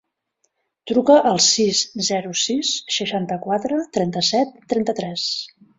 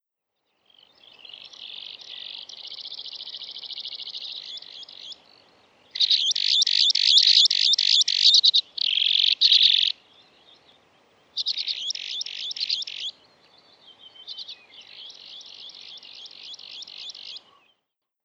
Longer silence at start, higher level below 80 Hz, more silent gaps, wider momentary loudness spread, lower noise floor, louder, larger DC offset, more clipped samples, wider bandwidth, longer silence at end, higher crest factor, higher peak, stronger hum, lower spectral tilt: second, 0.85 s vs 1.3 s; first, -62 dBFS vs -86 dBFS; neither; second, 9 LU vs 25 LU; second, -71 dBFS vs -80 dBFS; about the same, -19 LUFS vs -18 LUFS; neither; neither; about the same, 8 kHz vs 8.8 kHz; second, 0.3 s vs 0.85 s; about the same, 18 dB vs 22 dB; about the same, -2 dBFS vs -4 dBFS; neither; first, -3 dB/octave vs 4 dB/octave